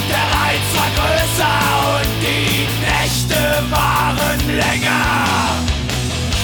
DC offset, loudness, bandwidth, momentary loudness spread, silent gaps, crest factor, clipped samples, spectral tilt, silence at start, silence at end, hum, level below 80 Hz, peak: under 0.1%; -15 LUFS; over 20 kHz; 3 LU; none; 12 dB; under 0.1%; -3.5 dB/octave; 0 s; 0 s; none; -28 dBFS; -4 dBFS